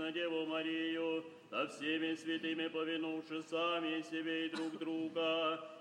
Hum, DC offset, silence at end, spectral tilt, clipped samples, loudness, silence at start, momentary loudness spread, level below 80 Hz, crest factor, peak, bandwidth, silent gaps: none; under 0.1%; 0 s; -4.5 dB/octave; under 0.1%; -39 LUFS; 0 s; 5 LU; under -90 dBFS; 16 dB; -24 dBFS; 10.5 kHz; none